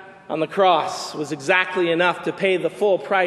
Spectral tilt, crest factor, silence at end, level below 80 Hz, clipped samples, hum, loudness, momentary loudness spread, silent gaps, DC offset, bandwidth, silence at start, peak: -4.5 dB/octave; 18 dB; 0 s; -74 dBFS; under 0.1%; none; -20 LUFS; 10 LU; none; under 0.1%; 12.5 kHz; 0 s; -4 dBFS